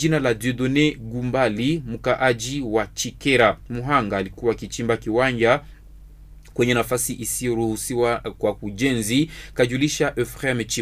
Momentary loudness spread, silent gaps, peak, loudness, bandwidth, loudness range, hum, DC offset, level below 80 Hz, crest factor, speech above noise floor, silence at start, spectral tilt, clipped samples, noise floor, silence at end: 6 LU; none; -2 dBFS; -22 LUFS; 15.5 kHz; 2 LU; none; under 0.1%; -44 dBFS; 20 dB; 22 dB; 0 s; -4.5 dB/octave; under 0.1%; -44 dBFS; 0 s